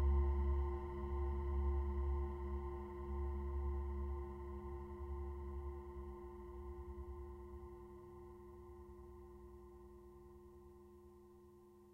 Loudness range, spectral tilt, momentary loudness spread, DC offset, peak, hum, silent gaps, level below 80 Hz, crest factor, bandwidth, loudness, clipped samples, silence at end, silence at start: 16 LU; -10 dB/octave; 20 LU; under 0.1%; -28 dBFS; none; none; -46 dBFS; 16 dB; 3.2 kHz; -45 LUFS; under 0.1%; 0 s; 0 s